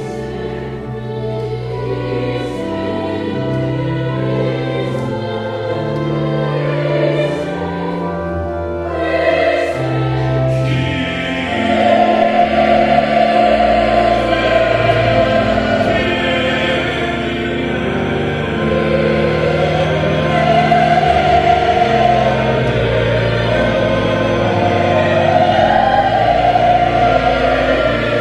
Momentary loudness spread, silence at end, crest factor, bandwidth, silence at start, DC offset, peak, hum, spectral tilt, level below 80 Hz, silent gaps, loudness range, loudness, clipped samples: 9 LU; 0 s; 14 dB; 11 kHz; 0 s; under 0.1%; 0 dBFS; none; -7 dB/octave; -32 dBFS; none; 6 LU; -15 LUFS; under 0.1%